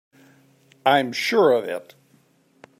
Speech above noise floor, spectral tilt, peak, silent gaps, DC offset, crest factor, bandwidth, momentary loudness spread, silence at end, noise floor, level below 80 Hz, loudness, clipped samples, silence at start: 40 dB; -4 dB/octave; -4 dBFS; none; under 0.1%; 20 dB; 16 kHz; 12 LU; 1 s; -60 dBFS; -78 dBFS; -20 LUFS; under 0.1%; 0.85 s